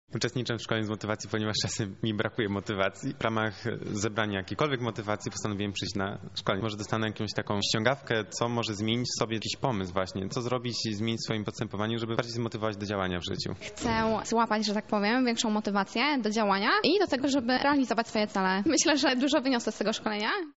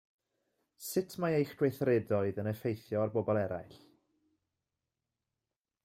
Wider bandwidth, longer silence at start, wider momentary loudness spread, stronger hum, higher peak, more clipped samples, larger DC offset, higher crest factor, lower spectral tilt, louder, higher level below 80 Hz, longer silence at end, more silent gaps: second, 8 kHz vs 16 kHz; second, 0.1 s vs 0.8 s; about the same, 7 LU vs 7 LU; neither; first, -8 dBFS vs -18 dBFS; neither; first, 0.1% vs under 0.1%; about the same, 22 dB vs 18 dB; second, -3.5 dB/octave vs -7 dB/octave; first, -29 LUFS vs -34 LUFS; first, -58 dBFS vs -74 dBFS; second, 0.05 s vs 2.1 s; neither